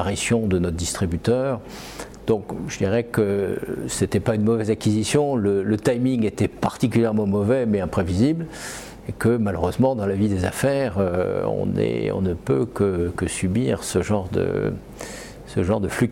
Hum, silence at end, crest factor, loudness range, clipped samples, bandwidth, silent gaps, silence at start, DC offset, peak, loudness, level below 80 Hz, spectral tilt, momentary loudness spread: none; 0 s; 16 dB; 3 LU; under 0.1%; 16.5 kHz; none; 0 s; under 0.1%; -6 dBFS; -22 LUFS; -44 dBFS; -6 dB/octave; 9 LU